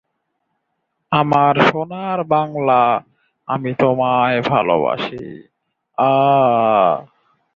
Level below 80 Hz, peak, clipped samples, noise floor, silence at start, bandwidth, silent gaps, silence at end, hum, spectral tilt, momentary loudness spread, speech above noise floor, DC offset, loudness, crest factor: -58 dBFS; 0 dBFS; under 0.1%; -72 dBFS; 1.1 s; 7.2 kHz; none; 0.55 s; none; -7.5 dB/octave; 11 LU; 57 dB; under 0.1%; -16 LUFS; 18 dB